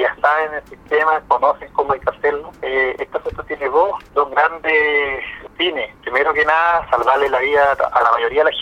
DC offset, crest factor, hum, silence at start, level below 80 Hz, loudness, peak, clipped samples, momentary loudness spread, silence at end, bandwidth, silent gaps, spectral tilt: under 0.1%; 16 dB; none; 0 s; -46 dBFS; -17 LUFS; -2 dBFS; under 0.1%; 10 LU; 0 s; 8.4 kHz; none; -4.5 dB/octave